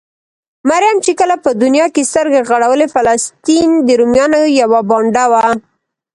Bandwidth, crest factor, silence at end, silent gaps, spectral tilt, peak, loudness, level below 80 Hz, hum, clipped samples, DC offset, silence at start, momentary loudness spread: 11.5 kHz; 12 dB; 0.55 s; none; -3.5 dB/octave; 0 dBFS; -11 LUFS; -50 dBFS; none; under 0.1%; under 0.1%; 0.65 s; 3 LU